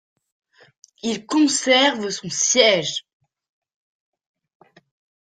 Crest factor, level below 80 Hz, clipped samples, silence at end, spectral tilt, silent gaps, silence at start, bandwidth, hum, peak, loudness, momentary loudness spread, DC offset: 22 dB; -68 dBFS; under 0.1%; 2.25 s; -1.5 dB/octave; none; 1.05 s; 10 kHz; none; -2 dBFS; -18 LUFS; 12 LU; under 0.1%